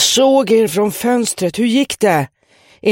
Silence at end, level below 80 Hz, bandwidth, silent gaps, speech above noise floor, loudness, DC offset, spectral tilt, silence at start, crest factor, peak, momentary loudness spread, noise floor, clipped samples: 0 s; -56 dBFS; 16.5 kHz; none; 30 dB; -14 LUFS; under 0.1%; -3.5 dB/octave; 0 s; 14 dB; 0 dBFS; 7 LU; -44 dBFS; under 0.1%